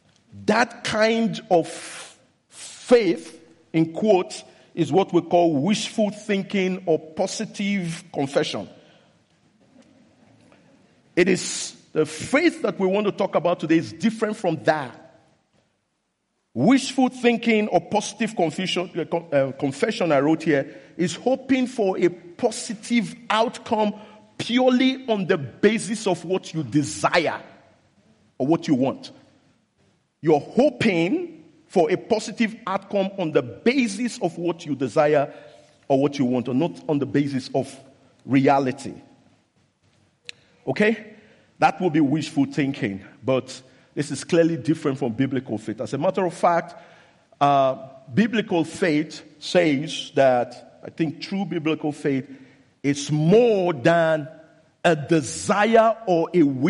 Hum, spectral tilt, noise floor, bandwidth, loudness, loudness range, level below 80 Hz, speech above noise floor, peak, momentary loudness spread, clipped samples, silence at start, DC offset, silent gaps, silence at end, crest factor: none; -5.5 dB/octave; -74 dBFS; 11.5 kHz; -22 LUFS; 4 LU; -66 dBFS; 52 dB; -6 dBFS; 11 LU; under 0.1%; 0.35 s; under 0.1%; none; 0 s; 18 dB